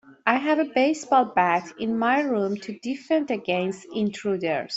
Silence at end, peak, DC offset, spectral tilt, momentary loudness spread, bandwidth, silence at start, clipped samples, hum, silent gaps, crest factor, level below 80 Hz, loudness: 0 s; -4 dBFS; under 0.1%; -5 dB/octave; 8 LU; 8.2 kHz; 0.1 s; under 0.1%; none; none; 20 dB; -68 dBFS; -24 LUFS